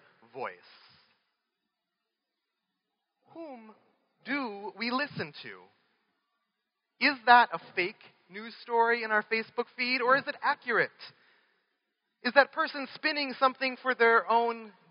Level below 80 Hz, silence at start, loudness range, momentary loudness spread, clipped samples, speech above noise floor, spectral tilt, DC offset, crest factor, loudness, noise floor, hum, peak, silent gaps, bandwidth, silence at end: under -90 dBFS; 0.35 s; 11 LU; 20 LU; under 0.1%; 56 dB; -0.5 dB/octave; under 0.1%; 26 dB; -28 LUFS; -86 dBFS; none; -6 dBFS; none; 5.6 kHz; 0.2 s